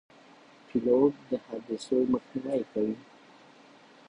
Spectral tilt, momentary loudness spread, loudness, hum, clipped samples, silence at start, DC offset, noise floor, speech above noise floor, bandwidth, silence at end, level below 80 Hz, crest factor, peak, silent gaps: -7 dB/octave; 12 LU; -29 LUFS; none; under 0.1%; 0.75 s; under 0.1%; -55 dBFS; 27 dB; 10.5 kHz; 1.1 s; -68 dBFS; 20 dB; -10 dBFS; none